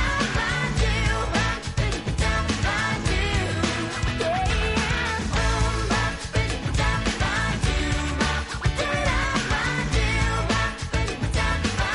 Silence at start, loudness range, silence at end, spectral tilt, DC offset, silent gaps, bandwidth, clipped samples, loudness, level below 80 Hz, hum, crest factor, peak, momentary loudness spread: 0 s; 1 LU; 0 s; -4.5 dB/octave; under 0.1%; none; 11.5 kHz; under 0.1%; -24 LUFS; -28 dBFS; none; 14 dB; -10 dBFS; 3 LU